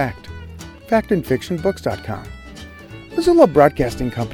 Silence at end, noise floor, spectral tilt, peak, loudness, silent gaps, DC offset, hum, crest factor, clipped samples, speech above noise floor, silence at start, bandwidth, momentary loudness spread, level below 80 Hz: 0 s; -37 dBFS; -6.5 dB/octave; 0 dBFS; -18 LUFS; none; under 0.1%; none; 18 dB; under 0.1%; 20 dB; 0 s; 17.5 kHz; 24 LU; -38 dBFS